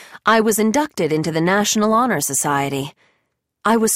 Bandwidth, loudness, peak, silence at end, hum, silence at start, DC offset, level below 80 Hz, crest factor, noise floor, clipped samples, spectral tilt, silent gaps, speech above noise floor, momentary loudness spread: 16.5 kHz; -18 LUFS; -4 dBFS; 0 s; none; 0 s; under 0.1%; -58 dBFS; 14 dB; -71 dBFS; under 0.1%; -3.5 dB/octave; none; 54 dB; 8 LU